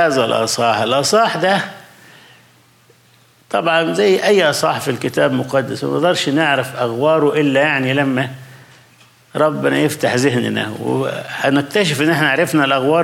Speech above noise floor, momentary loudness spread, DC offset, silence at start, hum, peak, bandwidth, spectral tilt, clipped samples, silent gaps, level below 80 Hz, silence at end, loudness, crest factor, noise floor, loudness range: 36 dB; 6 LU; under 0.1%; 0 s; none; -2 dBFS; 16.5 kHz; -4.5 dB/octave; under 0.1%; none; -64 dBFS; 0 s; -16 LUFS; 14 dB; -51 dBFS; 3 LU